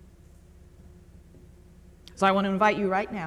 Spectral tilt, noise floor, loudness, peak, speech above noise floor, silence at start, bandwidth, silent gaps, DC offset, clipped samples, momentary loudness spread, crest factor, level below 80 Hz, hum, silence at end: -6 dB/octave; -52 dBFS; -24 LUFS; -8 dBFS; 28 dB; 2.15 s; 12 kHz; none; under 0.1%; under 0.1%; 4 LU; 20 dB; -54 dBFS; none; 0 s